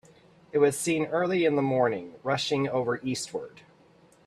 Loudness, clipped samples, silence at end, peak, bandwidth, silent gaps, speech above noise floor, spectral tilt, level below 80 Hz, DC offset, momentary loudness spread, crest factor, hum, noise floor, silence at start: -27 LUFS; under 0.1%; 0.8 s; -10 dBFS; 14 kHz; none; 32 dB; -4.5 dB/octave; -68 dBFS; under 0.1%; 9 LU; 18 dB; none; -59 dBFS; 0.55 s